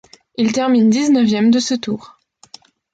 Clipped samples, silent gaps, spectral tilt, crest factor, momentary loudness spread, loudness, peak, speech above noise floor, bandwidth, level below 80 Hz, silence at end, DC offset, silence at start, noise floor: under 0.1%; none; -5 dB/octave; 12 dB; 12 LU; -15 LUFS; -6 dBFS; 30 dB; 9 kHz; -60 dBFS; 0.9 s; under 0.1%; 0.4 s; -45 dBFS